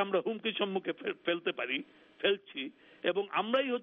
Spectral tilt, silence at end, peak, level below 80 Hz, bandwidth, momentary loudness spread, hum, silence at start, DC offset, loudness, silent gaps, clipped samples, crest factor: -1.5 dB/octave; 0 s; -16 dBFS; -82 dBFS; 4.4 kHz; 9 LU; none; 0 s; under 0.1%; -34 LUFS; none; under 0.1%; 18 dB